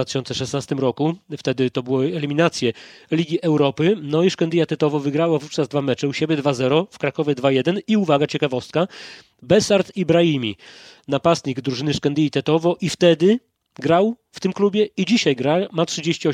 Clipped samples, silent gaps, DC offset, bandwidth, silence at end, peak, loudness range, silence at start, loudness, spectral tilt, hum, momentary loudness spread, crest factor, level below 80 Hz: under 0.1%; none; under 0.1%; 12.5 kHz; 0 s; -2 dBFS; 2 LU; 0 s; -20 LUFS; -5.5 dB/octave; none; 7 LU; 18 dB; -60 dBFS